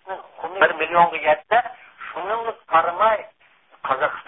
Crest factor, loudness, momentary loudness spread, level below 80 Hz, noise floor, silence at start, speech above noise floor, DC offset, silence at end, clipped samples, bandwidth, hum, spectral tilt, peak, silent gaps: 20 dB; -20 LUFS; 16 LU; -60 dBFS; -55 dBFS; 0.05 s; 37 dB; under 0.1%; 0.05 s; under 0.1%; 4 kHz; none; -8 dB/octave; -2 dBFS; none